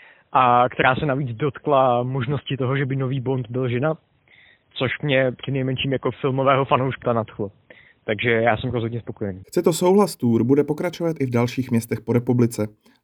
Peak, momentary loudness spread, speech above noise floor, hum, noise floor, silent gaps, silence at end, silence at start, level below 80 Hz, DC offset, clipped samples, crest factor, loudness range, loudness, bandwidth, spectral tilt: -2 dBFS; 11 LU; 33 dB; none; -54 dBFS; none; 0.35 s; 0.35 s; -54 dBFS; under 0.1%; under 0.1%; 20 dB; 4 LU; -21 LUFS; 19 kHz; -6.5 dB/octave